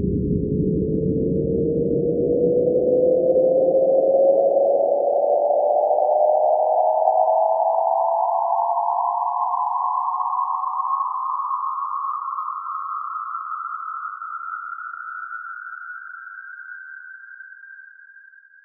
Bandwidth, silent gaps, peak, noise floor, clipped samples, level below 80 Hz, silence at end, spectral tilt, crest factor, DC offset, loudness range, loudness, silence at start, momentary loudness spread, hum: 1.8 kHz; none; -4 dBFS; -48 dBFS; under 0.1%; -44 dBFS; 0.45 s; 1.5 dB/octave; 16 dB; under 0.1%; 15 LU; -21 LUFS; 0 s; 17 LU; none